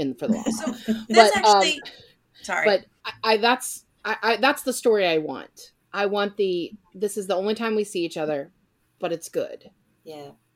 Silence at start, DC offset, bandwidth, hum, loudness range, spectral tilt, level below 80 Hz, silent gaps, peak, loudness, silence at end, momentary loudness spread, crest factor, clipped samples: 0 s; under 0.1%; 16.5 kHz; none; 8 LU; -3 dB/octave; -66 dBFS; none; 0 dBFS; -23 LUFS; 0.25 s; 19 LU; 24 dB; under 0.1%